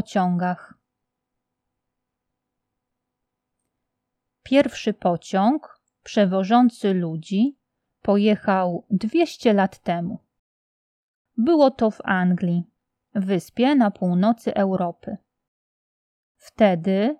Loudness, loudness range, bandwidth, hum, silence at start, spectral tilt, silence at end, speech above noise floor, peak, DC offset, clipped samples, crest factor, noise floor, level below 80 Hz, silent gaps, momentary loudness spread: -21 LUFS; 6 LU; 12 kHz; none; 0.1 s; -7 dB/octave; 0.05 s; 61 dB; -4 dBFS; under 0.1%; under 0.1%; 18 dB; -81 dBFS; -64 dBFS; 10.39-11.25 s, 15.48-16.35 s; 10 LU